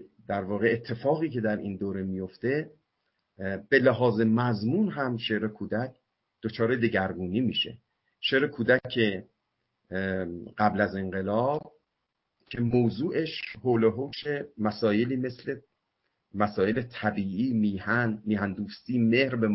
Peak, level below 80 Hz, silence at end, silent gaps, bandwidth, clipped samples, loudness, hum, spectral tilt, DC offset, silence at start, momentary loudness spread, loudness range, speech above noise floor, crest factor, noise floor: -8 dBFS; -58 dBFS; 0 s; none; 5.8 kHz; under 0.1%; -28 LUFS; none; -10.5 dB/octave; under 0.1%; 0 s; 10 LU; 3 LU; 54 dB; 20 dB; -82 dBFS